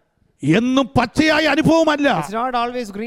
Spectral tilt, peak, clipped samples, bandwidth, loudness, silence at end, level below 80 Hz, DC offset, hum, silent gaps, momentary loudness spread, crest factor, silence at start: -5.5 dB/octave; 0 dBFS; under 0.1%; 15 kHz; -17 LUFS; 0 s; -44 dBFS; under 0.1%; none; none; 7 LU; 16 dB; 0.4 s